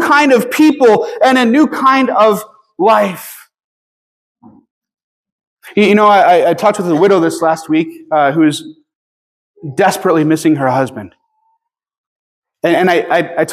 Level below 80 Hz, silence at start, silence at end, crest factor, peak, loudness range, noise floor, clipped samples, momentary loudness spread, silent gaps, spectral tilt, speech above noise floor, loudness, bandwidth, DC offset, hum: -64 dBFS; 0 s; 0 s; 12 dB; 0 dBFS; 5 LU; -65 dBFS; under 0.1%; 11 LU; 3.64-4.35 s, 4.71-4.82 s, 5.04-5.24 s, 5.32-5.39 s, 5.47-5.57 s, 8.95-9.54 s, 11.98-12.42 s; -5.5 dB/octave; 54 dB; -11 LUFS; 15.5 kHz; under 0.1%; none